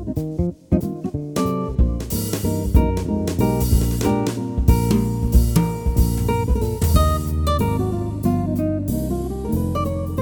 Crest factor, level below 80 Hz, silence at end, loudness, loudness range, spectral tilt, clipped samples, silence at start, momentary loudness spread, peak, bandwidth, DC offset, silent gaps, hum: 18 dB; -24 dBFS; 0 s; -21 LUFS; 2 LU; -7 dB/octave; under 0.1%; 0 s; 6 LU; -2 dBFS; over 20 kHz; under 0.1%; none; none